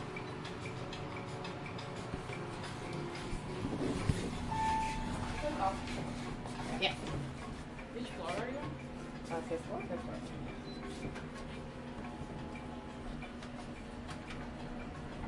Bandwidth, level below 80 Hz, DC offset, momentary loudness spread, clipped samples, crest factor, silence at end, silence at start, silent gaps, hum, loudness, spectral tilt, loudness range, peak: 11.5 kHz; -52 dBFS; under 0.1%; 10 LU; under 0.1%; 24 dB; 0 s; 0 s; none; none; -41 LUFS; -5.5 dB/octave; 8 LU; -16 dBFS